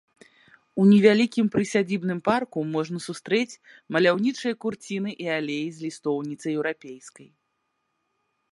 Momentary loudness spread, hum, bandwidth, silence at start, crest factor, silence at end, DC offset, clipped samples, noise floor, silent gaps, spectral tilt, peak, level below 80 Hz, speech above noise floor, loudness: 14 LU; none; 11.5 kHz; 0.75 s; 20 dB; 1.3 s; under 0.1%; under 0.1%; -76 dBFS; none; -6 dB/octave; -4 dBFS; -68 dBFS; 52 dB; -24 LUFS